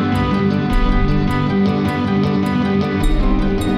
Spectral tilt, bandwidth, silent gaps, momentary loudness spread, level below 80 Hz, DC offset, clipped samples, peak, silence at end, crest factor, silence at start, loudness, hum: -7.5 dB/octave; 12.5 kHz; none; 2 LU; -20 dBFS; under 0.1%; under 0.1%; -4 dBFS; 0 s; 12 dB; 0 s; -17 LUFS; none